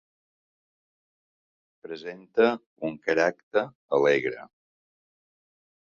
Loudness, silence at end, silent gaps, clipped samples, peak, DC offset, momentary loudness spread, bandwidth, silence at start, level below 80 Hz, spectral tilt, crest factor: -26 LUFS; 1.5 s; 2.66-2.76 s, 3.43-3.51 s, 3.75-3.88 s; under 0.1%; -8 dBFS; under 0.1%; 16 LU; 7.2 kHz; 1.85 s; -74 dBFS; -5.5 dB/octave; 20 dB